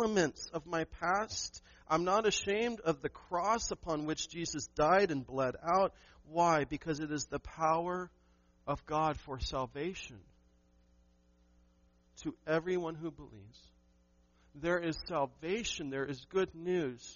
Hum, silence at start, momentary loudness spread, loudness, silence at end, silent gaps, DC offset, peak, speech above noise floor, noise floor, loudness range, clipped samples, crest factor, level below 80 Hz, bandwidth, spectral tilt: none; 0 s; 12 LU; -35 LUFS; 0 s; none; under 0.1%; -16 dBFS; 34 dB; -69 dBFS; 9 LU; under 0.1%; 20 dB; -58 dBFS; 7.2 kHz; -3.5 dB/octave